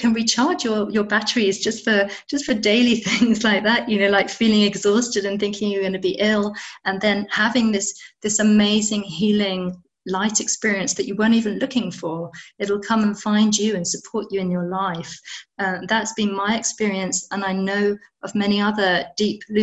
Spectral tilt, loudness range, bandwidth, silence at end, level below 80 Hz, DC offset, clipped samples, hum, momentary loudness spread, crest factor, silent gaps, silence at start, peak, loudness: -3.5 dB/octave; 5 LU; 8.4 kHz; 0 s; -58 dBFS; under 0.1%; under 0.1%; none; 9 LU; 16 dB; none; 0 s; -4 dBFS; -20 LUFS